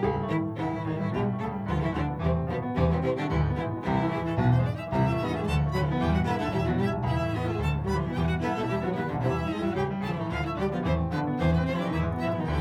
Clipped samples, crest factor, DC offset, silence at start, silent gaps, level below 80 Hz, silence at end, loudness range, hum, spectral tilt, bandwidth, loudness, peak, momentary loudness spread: under 0.1%; 16 dB; under 0.1%; 0 s; none; -38 dBFS; 0 s; 2 LU; none; -8 dB/octave; 11.5 kHz; -28 LUFS; -12 dBFS; 4 LU